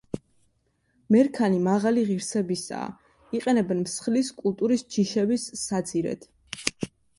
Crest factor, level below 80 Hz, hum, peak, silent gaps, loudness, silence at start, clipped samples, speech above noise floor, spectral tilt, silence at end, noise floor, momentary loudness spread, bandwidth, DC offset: 24 dB; -64 dBFS; none; -2 dBFS; none; -25 LUFS; 0.15 s; under 0.1%; 45 dB; -5 dB/octave; 0.3 s; -70 dBFS; 13 LU; 11.5 kHz; under 0.1%